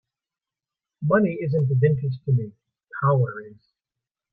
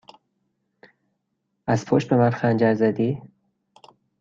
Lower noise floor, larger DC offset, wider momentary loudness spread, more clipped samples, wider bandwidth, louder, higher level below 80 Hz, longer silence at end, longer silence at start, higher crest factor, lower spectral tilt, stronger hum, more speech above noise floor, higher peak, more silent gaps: first, under -90 dBFS vs -76 dBFS; neither; first, 14 LU vs 8 LU; neither; second, 4.5 kHz vs 7.6 kHz; about the same, -23 LUFS vs -21 LUFS; about the same, -62 dBFS vs -62 dBFS; second, 0.8 s vs 0.95 s; second, 1 s vs 1.65 s; about the same, 18 dB vs 18 dB; first, -12.5 dB/octave vs -8 dB/octave; neither; first, over 68 dB vs 56 dB; about the same, -6 dBFS vs -6 dBFS; neither